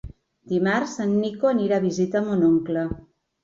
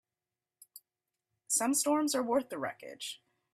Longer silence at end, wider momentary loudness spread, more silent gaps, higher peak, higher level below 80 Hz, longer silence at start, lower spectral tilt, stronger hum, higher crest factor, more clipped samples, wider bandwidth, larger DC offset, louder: about the same, 0.45 s vs 0.4 s; second, 7 LU vs 14 LU; neither; first, -10 dBFS vs -16 dBFS; first, -50 dBFS vs -80 dBFS; second, 0.05 s vs 0.75 s; first, -6.5 dB/octave vs -2 dB/octave; neither; about the same, 14 dB vs 18 dB; neither; second, 7.6 kHz vs 15.5 kHz; neither; first, -23 LUFS vs -32 LUFS